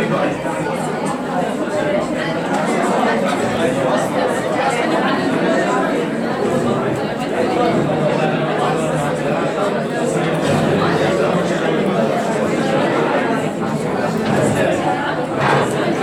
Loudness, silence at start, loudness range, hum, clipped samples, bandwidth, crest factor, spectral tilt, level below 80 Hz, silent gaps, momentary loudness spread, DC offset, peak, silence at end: -18 LUFS; 0 s; 1 LU; none; under 0.1%; 18.5 kHz; 14 dB; -5.5 dB/octave; -50 dBFS; none; 4 LU; under 0.1%; -2 dBFS; 0 s